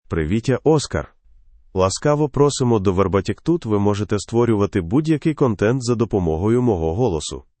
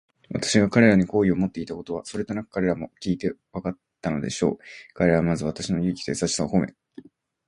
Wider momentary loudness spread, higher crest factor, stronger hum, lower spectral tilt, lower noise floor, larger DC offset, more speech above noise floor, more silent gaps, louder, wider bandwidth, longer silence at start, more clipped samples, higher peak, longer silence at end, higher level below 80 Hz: second, 4 LU vs 14 LU; second, 16 dB vs 22 dB; neither; about the same, -6.5 dB/octave vs -5.5 dB/octave; about the same, -50 dBFS vs -48 dBFS; neither; first, 31 dB vs 24 dB; neither; first, -19 LUFS vs -24 LUFS; second, 8.8 kHz vs 11.5 kHz; second, 0.1 s vs 0.3 s; neither; about the same, -4 dBFS vs -2 dBFS; second, 0.2 s vs 0.45 s; first, -42 dBFS vs -50 dBFS